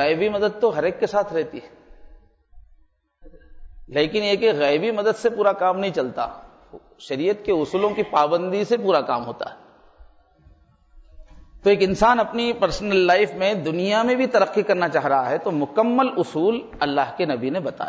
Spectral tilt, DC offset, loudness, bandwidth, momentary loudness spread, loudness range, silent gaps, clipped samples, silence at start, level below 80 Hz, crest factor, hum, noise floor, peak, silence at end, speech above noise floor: -5.5 dB/octave; under 0.1%; -21 LUFS; 8 kHz; 8 LU; 7 LU; none; under 0.1%; 0 s; -50 dBFS; 16 dB; none; -57 dBFS; -6 dBFS; 0 s; 36 dB